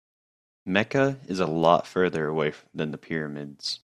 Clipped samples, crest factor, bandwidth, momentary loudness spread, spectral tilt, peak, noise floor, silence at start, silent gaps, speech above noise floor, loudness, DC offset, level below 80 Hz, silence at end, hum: under 0.1%; 22 dB; 12.5 kHz; 11 LU; -6 dB/octave; -4 dBFS; under -90 dBFS; 0.65 s; none; over 64 dB; -26 LUFS; under 0.1%; -64 dBFS; 0.05 s; none